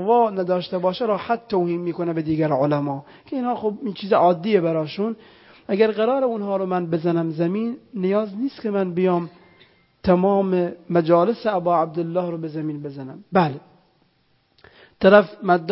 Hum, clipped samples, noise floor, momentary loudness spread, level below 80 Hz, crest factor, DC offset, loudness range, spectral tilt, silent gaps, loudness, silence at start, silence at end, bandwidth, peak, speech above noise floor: none; under 0.1%; -64 dBFS; 11 LU; -58 dBFS; 20 dB; under 0.1%; 3 LU; -11.5 dB/octave; none; -21 LUFS; 0 s; 0 s; 5.8 kHz; 0 dBFS; 43 dB